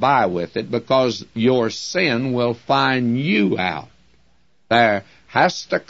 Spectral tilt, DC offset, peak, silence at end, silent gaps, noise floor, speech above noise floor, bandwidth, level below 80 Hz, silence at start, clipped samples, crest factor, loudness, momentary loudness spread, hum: -5.5 dB/octave; 0.2%; -2 dBFS; 0.1 s; none; -62 dBFS; 43 dB; 8 kHz; -58 dBFS; 0 s; under 0.1%; 16 dB; -19 LUFS; 7 LU; none